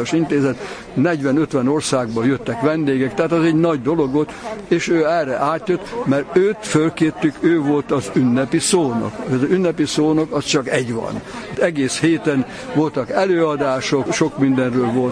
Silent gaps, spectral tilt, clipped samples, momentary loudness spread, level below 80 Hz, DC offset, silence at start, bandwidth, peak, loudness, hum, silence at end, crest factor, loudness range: none; -5.5 dB/octave; under 0.1%; 5 LU; -50 dBFS; under 0.1%; 0 s; 10.5 kHz; -2 dBFS; -18 LUFS; none; 0 s; 16 dB; 2 LU